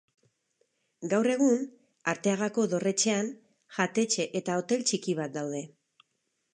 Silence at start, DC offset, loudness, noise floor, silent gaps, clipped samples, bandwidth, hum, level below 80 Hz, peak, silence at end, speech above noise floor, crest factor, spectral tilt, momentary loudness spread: 1 s; under 0.1%; -29 LUFS; -79 dBFS; none; under 0.1%; 11 kHz; none; -82 dBFS; -12 dBFS; 0.85 s; 50 dB; 18 dB; -4 dB/octave; 11 LU